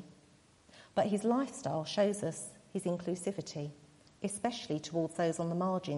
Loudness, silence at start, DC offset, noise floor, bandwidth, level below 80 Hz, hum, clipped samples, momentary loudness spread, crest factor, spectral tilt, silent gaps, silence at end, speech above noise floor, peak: -35 LUFS; 0 s; under 0.1%; -64 dBFS; 11.5 kHz; -72 dBFS; none; under 0.1%; 10 LU; 18 dB; -5.5 dB/octave; none; 0 s; 30 dB; -18 dBFS